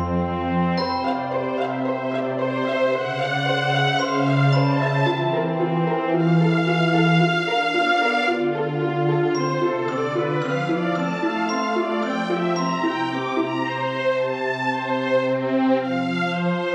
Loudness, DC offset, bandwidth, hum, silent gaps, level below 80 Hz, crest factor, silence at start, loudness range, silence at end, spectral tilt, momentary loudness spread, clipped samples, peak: -21 LUFS; under 0.1%; 9.2 kHz; none; none; -56 dBFS; 14 dB; 0 s; 3 LU; 0 s; -7 dB/octave; 5 LU; under 0.1%; -6 dBFS